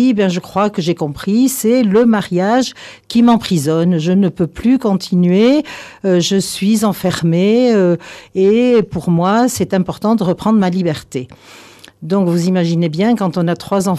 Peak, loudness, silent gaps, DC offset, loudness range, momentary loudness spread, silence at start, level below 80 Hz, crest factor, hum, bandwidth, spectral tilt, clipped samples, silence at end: -4 dBFS; -14 LUFS; none; under 0.1%; 3 LU; 8 LU; 0 s; -48 dBFS; 10 dB; none; 14.5 kHz; -6 dB/octave; under 0.1%; 0 s